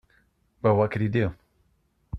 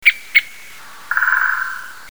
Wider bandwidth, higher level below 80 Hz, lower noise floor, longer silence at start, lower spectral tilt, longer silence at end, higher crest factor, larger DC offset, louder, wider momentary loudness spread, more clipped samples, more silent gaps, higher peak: second, 5.8 kHz vs over 20 kHz; first, -50 dBFS vs -62 dBFS; first, -68 dBFS vs -39 dBFS; first, 0.65 s vs 0 s; first, -9.5 dB/octave vs 1.5 dB/octave; about the same, 0 s vs 0 s; about the same, 18 dB vs 20 dB; second, under 0.1% vs 1%; second, -25 LUFS vs -16 LUFS; second, 5 LU vs 22 LU; neither; neither; second, -8 dBFS vs 0 dBFS